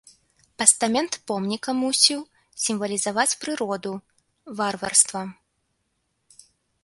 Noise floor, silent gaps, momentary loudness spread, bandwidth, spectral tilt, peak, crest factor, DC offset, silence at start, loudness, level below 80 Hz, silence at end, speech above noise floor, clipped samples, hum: -74 dBFS; none; 16 LU; 12.5 kHz; -1.5 dB/octave; 0 dBFS; 26 dB; under 0.1%; 0.6 s; -22 LUFS; -68 dBFS; 1.5 s; 50 dB; under 0.1%; none